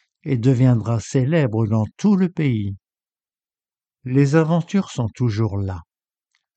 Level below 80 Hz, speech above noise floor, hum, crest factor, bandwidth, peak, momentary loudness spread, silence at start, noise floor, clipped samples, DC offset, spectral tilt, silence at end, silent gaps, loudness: -52 dBFS; over 72 dB; none; 16 dB; 8.6 kHz; -4 dBFS; 11 LU; 0.25 s; under -90 dBFS; under 0.1%; under 0.1%; -8 dB/octave; 0.75 s; none; -20 LUFS